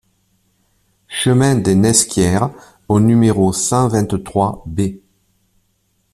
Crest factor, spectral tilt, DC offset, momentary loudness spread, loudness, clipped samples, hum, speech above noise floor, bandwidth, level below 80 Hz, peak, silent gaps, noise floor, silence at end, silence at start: 16 dB; -5 dB/octave; under 0.1%; 10 LU; -15 LUFS; under 0.1%; none; 49 dB; 14 kHz; -44 dBFS; 0 dBFS; none; -63 dBFS; 1.15 s; 1.1 s